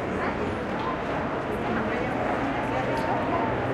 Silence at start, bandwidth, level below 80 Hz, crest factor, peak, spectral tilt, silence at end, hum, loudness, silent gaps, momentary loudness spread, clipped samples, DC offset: 0 s; 13.5 kHz; -46 dBFS; 12 dB; -14 dBFS; -7 dB/octave; 0 s; none; -27 LUFS; none; 3 LU; under 0.1%; under 0.1%